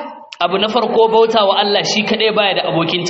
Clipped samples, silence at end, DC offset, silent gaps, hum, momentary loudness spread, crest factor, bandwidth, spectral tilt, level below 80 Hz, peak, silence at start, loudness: under 0.1%; 0 s; under 0.1%; none; none; 5 LU; 14 dB; 7.8 kHz; -2 dB/octave; -58 dBFS; -2 dBFS; 0 s; -14 LUFS